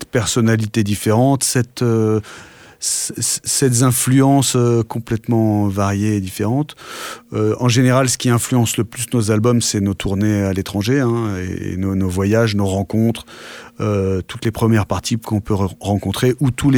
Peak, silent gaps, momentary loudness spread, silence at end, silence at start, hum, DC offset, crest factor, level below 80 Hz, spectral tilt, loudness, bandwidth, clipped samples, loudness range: -2 dBFS; none; 9 LU; 0 s; 0 s; none; under 0.1%; 14 dB; -44 dBFS; -5 dB/octave; -17 LUFS; 18.5 kHz; under 0.1%; 4 LU